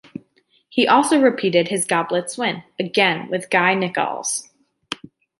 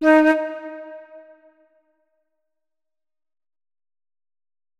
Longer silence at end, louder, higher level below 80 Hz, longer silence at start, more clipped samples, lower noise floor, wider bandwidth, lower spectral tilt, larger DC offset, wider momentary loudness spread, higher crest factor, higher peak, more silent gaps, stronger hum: second, 0.45 s vs 3.6 s; about the same, -19 LUFS vs -18 LUFS; about the same, -70 dBFS vs -74 dBFS; first, 0.7 s vs 0 s; neither; second, -61 dBFS vs under -90 dBFS; first, 12 kHz vs 9.4 kHz; about the same, -3.5 dB/octave vs -4.5 dB/octave; neither; second, 17 LU vs 25 LU; about the same, 18 dB vs 20 dB; about the same, -2 dBFS vs -4 dBFS; neither; neither